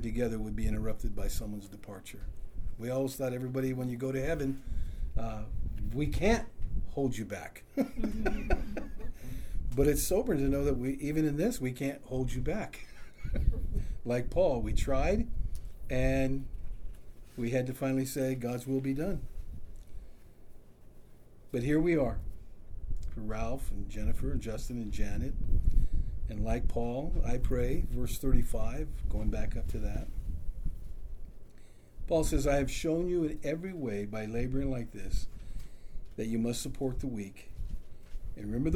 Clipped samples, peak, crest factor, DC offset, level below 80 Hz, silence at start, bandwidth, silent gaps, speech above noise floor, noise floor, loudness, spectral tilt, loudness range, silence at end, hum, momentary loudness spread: under 0.1%; -12 dBFS; 20 dB; under 0.1%; -36 dBFS; 0 s; 16 kHz; none; 21 dB; -51 dBFS; -34 LUFS; -6.5 dB/octave; 5 LU; 0 s; none; 18 LU